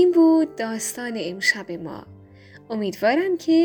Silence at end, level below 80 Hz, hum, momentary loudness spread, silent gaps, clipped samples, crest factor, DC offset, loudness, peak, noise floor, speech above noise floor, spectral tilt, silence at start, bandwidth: 0 s; -66 dBFS; none; 16 LU; none; under 0.1%; 16 dB; under 0.1%; -22 LUFS; -6 dBFS; -47 dBFS; 26 dB; -4 dB/octave; 0 s; over 20 kHz